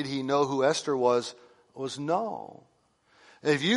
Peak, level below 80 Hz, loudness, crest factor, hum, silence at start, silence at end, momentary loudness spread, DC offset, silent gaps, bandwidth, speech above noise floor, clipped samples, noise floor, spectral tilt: -12 dBFS; -74 dBFS; -28 LUFS; 18 dB; none; 0 s; 0 s; 14 LU; under 0.1%; none; 11.5 kHz; 39 dB; under 0.1%; -67 dBFS; -4.5 dB/octave